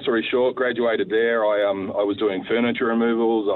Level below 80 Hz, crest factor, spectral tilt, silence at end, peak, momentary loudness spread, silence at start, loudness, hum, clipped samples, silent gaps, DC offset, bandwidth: -64 dBFS; 12 dB; -8.5 dB/octave; 0 s; -10 dBFS; 3 LU; 0 s; -21 LUFS; none; under 0.1%; none; under 0.1%; 4.3 kHz